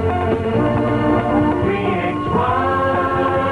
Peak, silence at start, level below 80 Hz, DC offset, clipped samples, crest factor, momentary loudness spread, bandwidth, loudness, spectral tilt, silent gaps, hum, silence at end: -4 dBFS; 0 s; -36 dBFS; under 0.1%; under 0.1%; 12 dB; 2 LU; 11 kHz; -18 LUFS; -8.5 dB/octave; none; none; 0 s